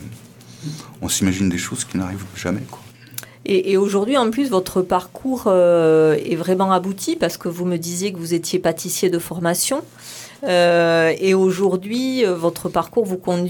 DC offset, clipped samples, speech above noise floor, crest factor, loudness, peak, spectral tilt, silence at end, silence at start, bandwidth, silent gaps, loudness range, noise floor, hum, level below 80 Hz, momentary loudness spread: under 0.1%; under 0.1%; 22 dB; 16 dB; -19 LUFS; -4 dBFS; -4.5 dB/octave; 0 s; 0 s; 19 kHz; none; 4 LU; -41 dBFS; none; -54 dBFS; 16 LU